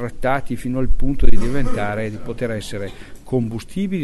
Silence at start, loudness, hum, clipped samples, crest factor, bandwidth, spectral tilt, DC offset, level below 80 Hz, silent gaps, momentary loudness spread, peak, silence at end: 0 s; -24 LUFS; none; 0.4%; 14 dB; 11 kHz; -7 dB/octave; under 0.1%; -22 dBFS; none; 6 LU; 0 dBFS; 0 s